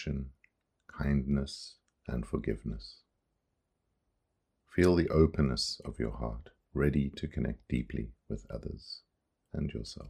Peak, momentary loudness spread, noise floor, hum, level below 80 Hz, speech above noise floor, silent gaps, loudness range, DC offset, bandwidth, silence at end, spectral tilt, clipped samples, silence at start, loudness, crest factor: -12 dBFS; 19 LU; -81 dBFS; none; -44 dBFS; 49 dB; none; 8 LU; under 0.1%; 14.5 kHz; 0 s; -6.5 dB/octave; under 0.1%; 0 s; -33 LUFS; 22 dB